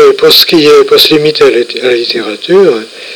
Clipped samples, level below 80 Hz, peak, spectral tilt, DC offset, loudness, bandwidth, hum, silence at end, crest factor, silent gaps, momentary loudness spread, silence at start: 7%; -46 dBFS; 0 dBFS; -3.5 dB/octave; under 0.1%; -5 LUFS; over 20 kHz; none; 0 s; 6 dB; none; 8 LU; 0 s